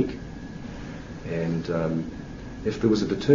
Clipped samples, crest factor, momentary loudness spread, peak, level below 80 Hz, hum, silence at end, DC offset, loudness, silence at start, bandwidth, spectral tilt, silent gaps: under 0.1%; 20 dB; 15 LU; -6 dBFS; -44 dBFS; none; 0 s; under 0.1%; -29 LUFS; 0 s; 7.6 kHz; -7 dB/octave; none